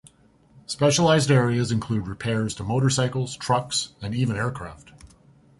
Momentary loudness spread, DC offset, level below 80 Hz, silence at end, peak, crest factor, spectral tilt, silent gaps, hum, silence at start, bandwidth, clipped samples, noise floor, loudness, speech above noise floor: 11 LU; under 0.1%; -50 dBFS; 0.55 s; -6 dBFS; 18 dB; -5 dB/octave; none; none; 0.7 s; 11.5 kHz; under 0.1%; -57 dBFS; -23 LUFS; 34 dB